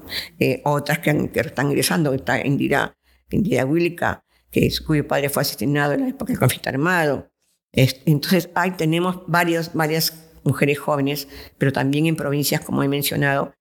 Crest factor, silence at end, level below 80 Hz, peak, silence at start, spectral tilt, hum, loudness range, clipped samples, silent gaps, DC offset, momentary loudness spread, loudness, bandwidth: 20 dB; 0.1 s; -48 dBFS; 0 dBFS; 0 s; -5.5 dB/octave; none; 1 LU; under 0.1%; 7.64-7.68 s; under 0.1%; 6 LU; -21 LUFS; 19 kHz